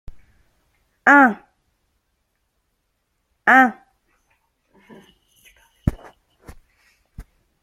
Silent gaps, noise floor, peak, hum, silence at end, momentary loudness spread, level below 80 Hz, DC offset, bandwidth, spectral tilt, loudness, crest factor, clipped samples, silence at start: none; -72 dBFS; 0 dBFS; none; 0.4 s; 15 LU; -44 dBFS; under 0.1%; 15.5 kHz; -6.5 dB/octave; -16 LUFS; 22 dB; under 0.1%; 1.05 s